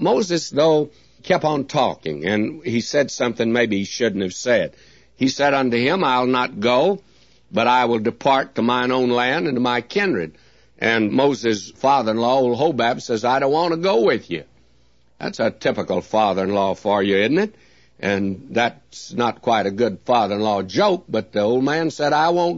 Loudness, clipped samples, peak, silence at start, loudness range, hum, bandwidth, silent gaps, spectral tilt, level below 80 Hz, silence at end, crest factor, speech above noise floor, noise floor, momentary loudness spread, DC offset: -19 LUFS; under 0.1%; -4 dBFS; 0 s; 2 LU; none; 8 kHz; none; -5 dB/octave; -60 dBFS; 0 s; 16 dB; 40 dB; -59 dBFS; 6 LU; 0.2%